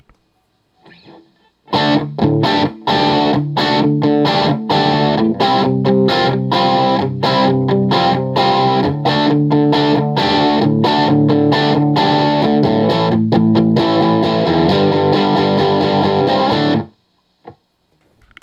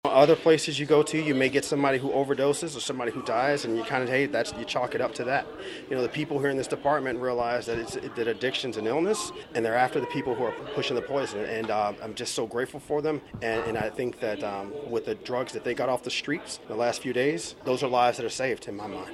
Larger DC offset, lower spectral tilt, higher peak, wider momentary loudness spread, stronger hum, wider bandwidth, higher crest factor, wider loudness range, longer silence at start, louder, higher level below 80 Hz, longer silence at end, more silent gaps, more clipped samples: neither; first, -7.5 dB/octave vs -4.5 dB/octave; first, 0 dBFS vs -4 dBFS; second, 3 LU vs 8 LU; neither; second, 8.2 kHz vs 13 kHz; second, 14 dB vs 22 dB; about the same, 3 LU vs 5 LU; first, 1.7 s vs 0.05 s; first, -14 LUFS vs -27 LUFS; first, -52 dBFS vs -62 dBFS; first, 0.9 s vs 0 s; neither; neither